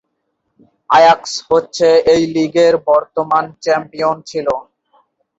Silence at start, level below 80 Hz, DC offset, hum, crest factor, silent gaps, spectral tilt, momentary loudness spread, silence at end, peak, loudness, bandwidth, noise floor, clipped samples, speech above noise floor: 0.9 s; -54 dBFS; under 0.1%; none; 14 dB; none; -4.5 dB/octave; 9 LU; 0.75 s; 0 dBFS; -14 LUFS; 8 kHz; -70 dBFS; under 0.1%; 56 dB